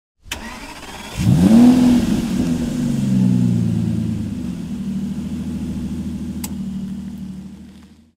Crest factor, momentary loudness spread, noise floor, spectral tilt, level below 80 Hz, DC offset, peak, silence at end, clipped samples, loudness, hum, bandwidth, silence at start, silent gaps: 16 dB; 20 LU; -43 dBFS; -7 dB/octave; -38 dBFS; under 0.1%; -2 dBFS; 0.3 s; under 0.1%; -18 LUFS; none; 16 kHz; 0.25 s; none